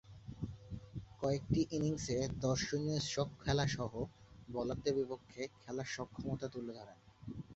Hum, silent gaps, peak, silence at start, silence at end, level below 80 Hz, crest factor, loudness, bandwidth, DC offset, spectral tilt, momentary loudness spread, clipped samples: none; none; -20 dBFS; 0.05 s; 0 s; -58 dBFS; 20 dB; -39 LUFS; 8 kHz; under 0.1%; -5.5 dB/octave; 15 LU; under 0.1%